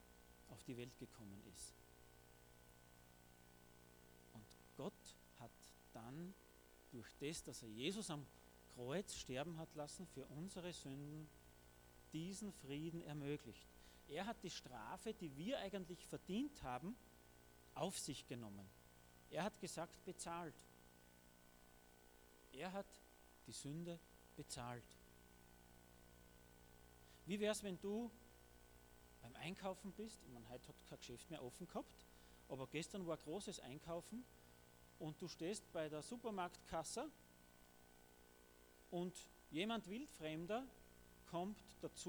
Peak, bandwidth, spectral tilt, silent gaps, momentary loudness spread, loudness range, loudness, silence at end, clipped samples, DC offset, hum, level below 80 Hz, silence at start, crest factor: -30 dBFS; over 20 kHz; -4.5 dB/octave; none; 20 LU; 9 LU; -51 LUFS; 0 s; under 0.1%; under 0.1%; 60 Hz at -75 dBFS; -72 dBFS; 0 s; 22 dB